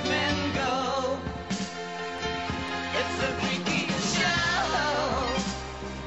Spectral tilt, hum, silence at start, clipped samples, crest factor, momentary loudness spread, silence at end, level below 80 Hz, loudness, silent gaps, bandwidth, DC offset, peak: -3.5 dB/octave; none; 0 s; under 0.1%; 16 dB; 9 LU; 0 s; -46 dBFS; -28 LUFS; none; 8.2 kHz; 0.2%; -12 dBFS